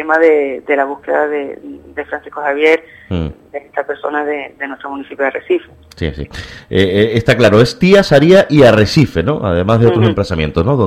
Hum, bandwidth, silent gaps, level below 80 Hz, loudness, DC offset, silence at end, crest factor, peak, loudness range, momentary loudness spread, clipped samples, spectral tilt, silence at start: none; 15 kHz; none; -36 dBFS; -13 LUFS; under 0.1%; 0 s; 12 dB; 0 dBFS; 11 LU; 16 LU; 0.3%; -6.5 dB/octave; 0 s